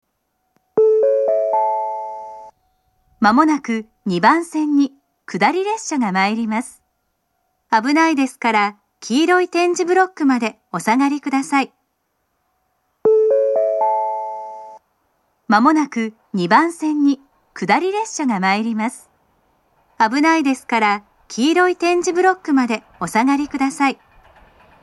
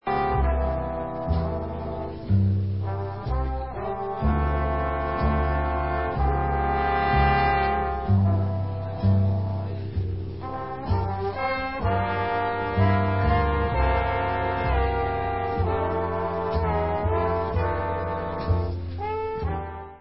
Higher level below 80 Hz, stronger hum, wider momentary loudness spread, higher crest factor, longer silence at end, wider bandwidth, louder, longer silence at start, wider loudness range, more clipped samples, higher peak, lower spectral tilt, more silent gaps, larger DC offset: second, -64 dBFS vs -30 dBFS; neither; about the same, 10 LU vs 8 LU; about the same, 18 dB vs 16 dB; first, 0.9 s vs 0 s; first, 12 kHz vs 5.8 kHz; first, -17 LUFS vs -25 LUFS; first, 0.75 s vs 0 s; about the same, 3 LU vs 4 LU; neither; first, 0 dBFS vs -8 dBFS; second, -4.5 dB/octave vs -12 dB/octave; neither; second, under 0.1% vs 0.5%